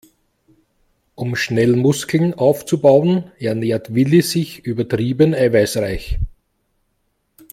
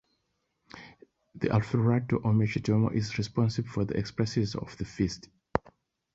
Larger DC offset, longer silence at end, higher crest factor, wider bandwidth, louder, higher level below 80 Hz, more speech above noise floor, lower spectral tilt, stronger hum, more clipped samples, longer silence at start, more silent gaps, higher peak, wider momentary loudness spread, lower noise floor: neither; first, 1.2 s vs 0.55 s; second, 18 dB vs 26 dB; first, 16.5 kHz vs 7.8 kHz; first, -17 LUFS vs -29 LUFS; first, -36 dBFS vs -52 dBFS; about the same, 52 dB vs 50 dB; about the same, -6 dB/octave vs -7 dB/octave; neither; neither; first, 1.2 s vs 0.75 s; neither; first, 0 dBFS vs -4 dBFS; about the same, 11 LU vs 11 LU; second, -68 dBFS vs -78 dBFS